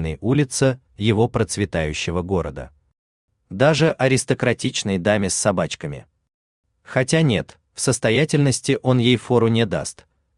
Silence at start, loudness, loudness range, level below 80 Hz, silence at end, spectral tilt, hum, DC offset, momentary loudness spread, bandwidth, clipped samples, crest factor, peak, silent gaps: 0 s; -20 LUFS; 3 LU; -46 dBFS; 0.45 s; -5 dB/octave; none; under 0.1%; 9 LU; 12.5 kHz; under 0.1%; 18 dB; -2 dBFS; 2.98-3.28 s, 6.34-6.64 s